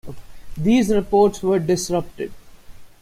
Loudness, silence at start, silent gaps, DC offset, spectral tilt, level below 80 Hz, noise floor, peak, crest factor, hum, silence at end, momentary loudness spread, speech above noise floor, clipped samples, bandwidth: -19 LUFS; 0.05 s; none; under 0.1%; -6 dB/octave; -42 dBFS; -39 dBFS; -4 dBFS; 16 dB; none; 0.15 s; 16 LU; 21 dB; under 0.1%; 15.5 kHz